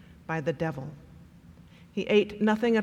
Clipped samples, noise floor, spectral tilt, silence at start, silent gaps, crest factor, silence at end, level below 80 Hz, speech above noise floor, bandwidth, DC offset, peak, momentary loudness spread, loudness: under 0.1%; -52 dBFS; -7 dB/octave; 0.1 s; none; 18 dB; 0 s; -60 dBFS; 25 dB; 10 kHz; under 0.1%; -10 dBFS; 15 LU; -28 LUFS